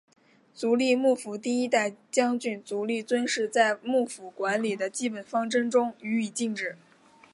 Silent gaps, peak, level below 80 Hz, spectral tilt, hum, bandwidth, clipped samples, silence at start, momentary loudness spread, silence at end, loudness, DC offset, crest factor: none; -8 dBFS; -82 dBFS; -3.5 dB/octave; none; 11.5 kHz; under 0.1%; 0.55 s; 8 LU; 0.6 s; -27 LUFS; under 0.1%; 20 dB